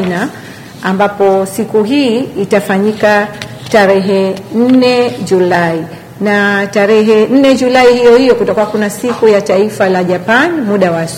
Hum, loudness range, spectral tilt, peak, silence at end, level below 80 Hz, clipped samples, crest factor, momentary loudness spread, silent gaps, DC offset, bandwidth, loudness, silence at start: none; 3 LU; -5.5 dB/octave; 0 dBFS; 0 s; -48 dBFS; 0.5%; 10 dB; 9 LU; none; under 0.1%; 16.5 kHz; -10 LUFS; 0 s